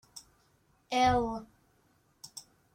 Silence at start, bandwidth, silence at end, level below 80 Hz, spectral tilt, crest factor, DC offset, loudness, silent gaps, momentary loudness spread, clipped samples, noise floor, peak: 0.15 s; 16 kHz; 0.35 s; -54 dBFS; -4.5 dB/octave; 18 dB; under 0.1%; -30 LUFS; none; 25 LU; under 0.1%; -69 dBFS; -16 dBFS